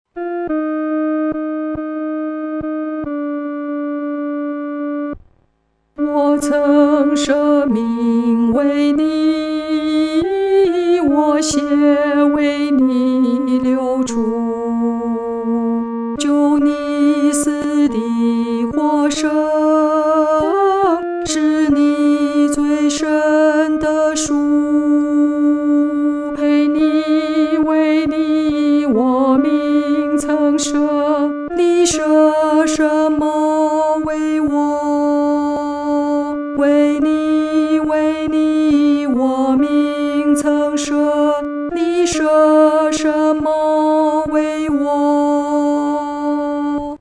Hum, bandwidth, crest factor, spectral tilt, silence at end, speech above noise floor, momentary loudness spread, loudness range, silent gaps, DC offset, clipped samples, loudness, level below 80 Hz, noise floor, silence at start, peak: none; 11 kHz; 12 dB; -4.5 dB/octave; 0.05 s; 48 dB; 7 LU; 3 LU; none; under 0.1%; under 0.1%; -15 LUFS; -48 dBFS; -62 dBFS; 0.15 s; -2 dBFS